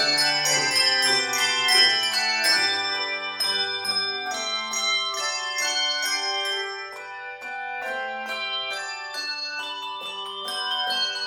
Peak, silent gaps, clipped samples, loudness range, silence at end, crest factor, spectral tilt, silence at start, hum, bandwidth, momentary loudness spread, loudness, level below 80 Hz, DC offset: -6 dBFS; none; under 0.1%; 10 LU; 0 s; 20 dB; 0.5 dB/octave; 0 s; none; 17.5 kHz; 13 LU; -22 LUFS; -74 dBFS; under 0.1%